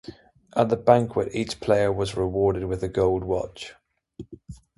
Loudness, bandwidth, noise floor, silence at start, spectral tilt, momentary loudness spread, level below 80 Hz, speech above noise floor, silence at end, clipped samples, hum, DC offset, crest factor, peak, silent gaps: -24 LUFS; 11.5 kHz; -45 dBFS; 0.1 s; -6.5 dB/octave; 23 LU; -46 dBFS; 22 dB; 0.2 s; under 0.1%; none; under 0.1%; 24 dB; -2 dBFS; none